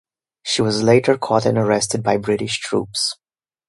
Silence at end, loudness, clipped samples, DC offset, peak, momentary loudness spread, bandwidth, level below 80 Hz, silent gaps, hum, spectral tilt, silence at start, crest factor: 0.55 s; -18 LUFS; under 0.1%; under 0.1%; 0 dBFS; 8 LU; 11.5 kHz; -54 dBFS; none; none; -4.5 dB/octave; 0.45 s; 18 dB